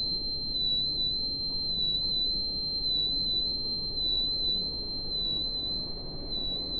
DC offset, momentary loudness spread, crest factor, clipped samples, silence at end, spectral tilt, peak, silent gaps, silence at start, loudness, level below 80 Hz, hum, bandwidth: under 0.1%; 5 LU; 10 dB; under 0.1%; 0 s; -7.5 dB/octave; -20 dBFS; none; 0 s; -28 LUFS; -44 dBFS; none; 4.6 kHz